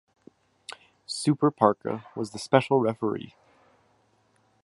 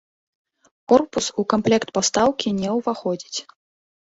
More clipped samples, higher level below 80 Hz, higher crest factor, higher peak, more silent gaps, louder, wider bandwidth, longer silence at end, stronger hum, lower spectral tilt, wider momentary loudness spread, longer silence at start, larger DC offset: neither; second, -70 dBFS vs -58 dBFS; about the same, 24 dB vs 20 dB; about the same, -4 dBFS vs -2 dBFS; neither; second, -26 LUFS vs -21 LUFS; first, 11.5 kHz vs 8 kHz; first, 1.35 s vs 0.75 s; neither; first, -6 dB/octave vs -4 dB/octave; first, 22 LU vs 9 LU; second, 0.7 s vs 0.9 s; neither